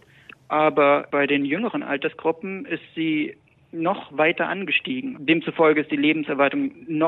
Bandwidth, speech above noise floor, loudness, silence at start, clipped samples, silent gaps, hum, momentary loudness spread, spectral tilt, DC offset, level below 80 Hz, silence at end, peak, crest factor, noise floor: 4.2 kHz; 27 dB; -22 LUFS; 0.5 s; under 0.1%; none; none; 10 LU; -8 dB/octave; under 0.1%; -72 dBFS; 0 s; -6 dBFS; 16 dB; -49 dBFS